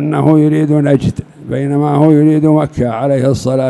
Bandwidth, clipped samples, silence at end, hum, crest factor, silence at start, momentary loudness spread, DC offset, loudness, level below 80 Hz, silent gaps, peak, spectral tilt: 11.5 kHz; 0.3%; 0 s; none; 10 dB; 0 s; 9 LU; under 0.1%; -11 LUFS; -42 dBFS; none; 0 dBFS; -8.5 dB/octave